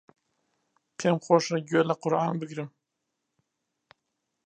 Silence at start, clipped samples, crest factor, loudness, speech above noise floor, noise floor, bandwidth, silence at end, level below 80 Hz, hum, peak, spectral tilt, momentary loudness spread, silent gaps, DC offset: 1 s; under 0.1%; 24 dB; -26 LUFS; 56 dB; -82 dBFS; 9.2 kHz; 1.8 s; -78 dBFS; none; -6 dBFS; -5.5 dB/octave; 15 LU; none; under 0.1%